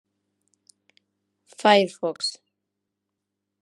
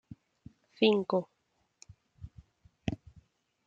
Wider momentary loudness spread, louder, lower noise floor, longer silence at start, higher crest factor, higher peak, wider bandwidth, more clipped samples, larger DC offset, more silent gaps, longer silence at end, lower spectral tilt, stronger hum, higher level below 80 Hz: second, 11 LU vs 26 LU; first, -22 LUFS vs -31 LUFS; first, -82 dBFS vs -77 dBFS; first, 1.6 s vs 0.8 s; about the same, 22 dB vs 22 dB; first, -4 dBFS vs -14 dBFS; first, 12 kHz vs 7.6 kHz; neither; neither; neither; first, 1.3 s vs 0.7 s; second, -3.5 dB/octave vs -6.5 dB/octave; neither; second, -88 dBFS vs -60 dBFS